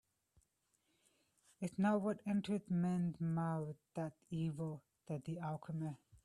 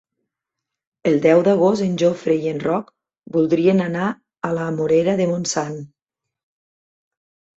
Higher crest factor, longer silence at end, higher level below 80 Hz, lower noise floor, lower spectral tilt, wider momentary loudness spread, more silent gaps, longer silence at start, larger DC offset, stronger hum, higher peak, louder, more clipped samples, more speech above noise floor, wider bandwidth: about the same, 18 dB vs 18 dB; second, 0.1 s vs 1.75 s; second, -76 dBFS vs -60 dBFS; about the same, -82 dBFS vs -83 dBFS; first, -8 dB/octave vs -6 dB/octave; about the same, 11 LU vs 11 LU; neither; first, 1.6 s vs 1.05 s; neither; neither; second, -24 dBFS vs -2 dBFS; second, -41 LUFS vs -19 LUFS; neither; second, 42 dB vs 65 dB; first, 11 kHz vs 8 kHz